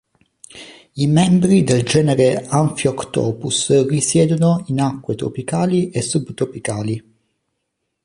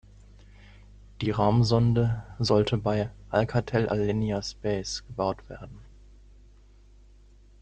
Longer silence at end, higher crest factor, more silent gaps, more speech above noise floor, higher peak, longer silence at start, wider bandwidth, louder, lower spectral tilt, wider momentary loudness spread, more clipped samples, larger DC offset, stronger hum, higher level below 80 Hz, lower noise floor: second, 1.05 s vs 1.75 s; about the same, 16 dB vs 20 dB; neither; first, 58 dB vs 28 dB; first, -2 dBFS vs -8 dBFS; second, 0.55 s vs 1.2 s; first, 11.5 kHz vs 8.8 kHz; first, -17 LUFS vs -27 LUFS; about the same, -5.5 dB/octave vs -6.5 dB/octave; about the same, 11 LU vs 11 LU; neither; neither; neither; about the same, -50 dBFS vs -48 dBFS; first, -74 dBFS vs -54 dBFS